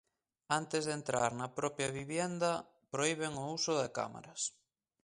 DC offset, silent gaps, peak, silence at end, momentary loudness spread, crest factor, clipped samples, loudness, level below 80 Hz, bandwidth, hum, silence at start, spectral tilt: under 0.1%; none; -16 dBFS; 0.55 s; 6 LU; 22 dB; under 0.1%; -37 LUFS; -72 dBFS; 11.5 kHz; none; 0.5 s; -3.5 dB/octave